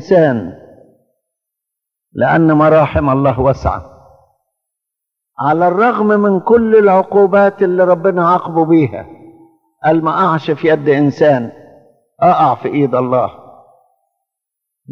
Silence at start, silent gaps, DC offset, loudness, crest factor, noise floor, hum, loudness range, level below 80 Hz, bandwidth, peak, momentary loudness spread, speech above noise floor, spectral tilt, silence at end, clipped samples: 0 s; none; under 0.1%; -12 LUFS; 14 dB; -81 dBFS; none; 5 LU; -40 dBFS; 6.6 kHz; 0 dBFS; 9 LU; 69 dB; -9 dB/octave; 0 s; under 0.1%